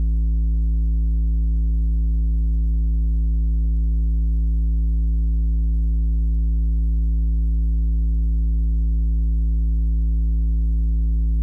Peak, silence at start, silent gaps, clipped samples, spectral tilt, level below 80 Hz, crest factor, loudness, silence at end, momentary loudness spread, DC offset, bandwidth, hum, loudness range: -16 dBFS; 0 s; none; under 0.1%; -12.5 dB/octave; -18 dBFS; 2 dB; -22 LUFS; 0 s; 0 LU; under 0.1%; 0.5 kHz; none; 0 LU